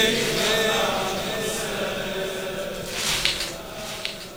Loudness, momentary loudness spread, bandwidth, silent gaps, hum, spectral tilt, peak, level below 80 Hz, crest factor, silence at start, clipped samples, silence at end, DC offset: -24 LUFS; 10 LU; 19 kHz; none; none; -2 dB/octave; 0 dBFS; -46 dBFS; 26 dB; 0 s; under 0.1%; 0 s; 0.2%